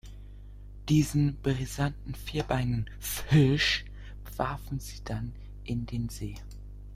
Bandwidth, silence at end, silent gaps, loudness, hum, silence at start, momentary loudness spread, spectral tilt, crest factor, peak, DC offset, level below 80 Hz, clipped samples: 16 kHz; 0 s; none; -30 LUFS; 50 Hz at -40 dBFS; 0.05 s; 22 LU; -5.5 dB/octave; 20 dB; -10 dBFS; under 0.1%; -42 dBFS; under 0.1%